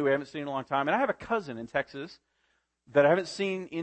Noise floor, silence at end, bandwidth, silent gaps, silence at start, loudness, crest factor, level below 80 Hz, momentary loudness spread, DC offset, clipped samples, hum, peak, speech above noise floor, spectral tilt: -74 dBFS; 0 s; 8.8 kHz; none; 0 s; -29 LUFS; 20 dB; -66 dBFS; 11 LU; under 0.1%; under 0.1%; none; -10 dBFS; 46 dB; -5.5 dB/octave